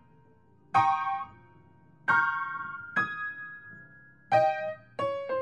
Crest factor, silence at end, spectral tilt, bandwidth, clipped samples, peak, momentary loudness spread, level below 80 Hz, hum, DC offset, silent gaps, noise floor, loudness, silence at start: 22 dB; 0 s; -5 dB/octave; 10 kHz; under 0.1%; -10 dBFS; 18 LU; -74 dBFS; none; under 0.1%; none; -61 dBFS; -29 LUFS; 0.75 s